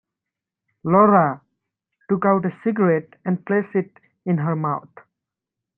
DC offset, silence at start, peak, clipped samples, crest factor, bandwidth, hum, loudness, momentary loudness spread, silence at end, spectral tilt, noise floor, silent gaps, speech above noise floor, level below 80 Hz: under 0.1%; 0.85 s; -2 dBFS; under 0.1%; 20 dB; 3.2 kHz; none; -20 LUFS; 15 LU; 1 s; -12.5 dB/octave; -86 dBFS; none; 66 dB; -66 dBFS